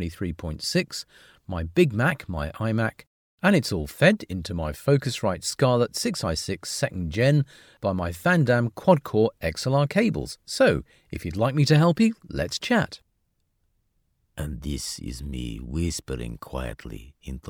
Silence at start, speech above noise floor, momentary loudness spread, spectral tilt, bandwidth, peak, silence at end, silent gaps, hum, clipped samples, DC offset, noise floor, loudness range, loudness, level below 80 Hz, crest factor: 0 s; 48 dB; 14 LU; -5.5 dB/octave; 18.5 kHz; -4 dBFS; 0 s; 3.07-3.38 s; none; under 0.1%; under 0.1%; -72 dBFS; 10 LU; -25 LUFS; -42 dBFS; 20 dB